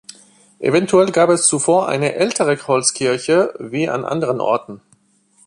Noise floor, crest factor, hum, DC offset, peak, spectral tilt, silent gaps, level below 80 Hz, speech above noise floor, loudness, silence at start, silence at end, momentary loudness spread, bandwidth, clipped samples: -57 dBFS; 18 dB; none; under 0.1%; 0 dBFS; -4 dB/octave; none; -60 dBFS; 41 dB; -16 LUFS; 0.6 s; 0.7 s; 8 LU; 11.5 kHz; under 0.1%